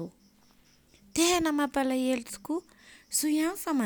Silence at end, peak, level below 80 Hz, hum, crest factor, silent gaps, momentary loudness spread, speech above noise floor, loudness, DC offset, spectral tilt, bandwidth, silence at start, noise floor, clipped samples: 0 s; -12 dBFS; -60 dBFS; none; 18 dB; none; 11 LU; 34 dB; -29 LUFS; under 0.1%; -2.5 dB/octave; over 20 kHz; 0 s; -62 dBFS; under 0.1%